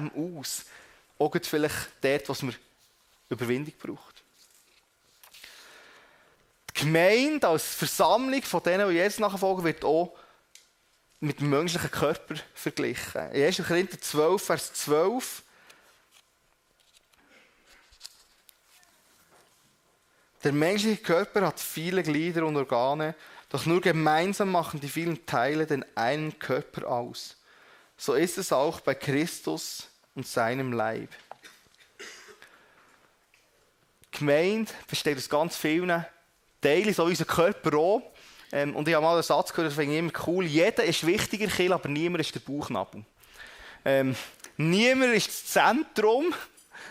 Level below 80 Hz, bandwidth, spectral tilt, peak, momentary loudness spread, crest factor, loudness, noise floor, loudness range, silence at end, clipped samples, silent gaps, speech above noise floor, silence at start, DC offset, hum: -66 dBFS; 16 kHz; -4.5 dB/octave; -8 dBFS; 16 LU; 20 dB; -27 LUFS; -68 dBFS; 9 LU; 0 s; under 0.1%; none; 41 dB; 0 s; under 0.1%; none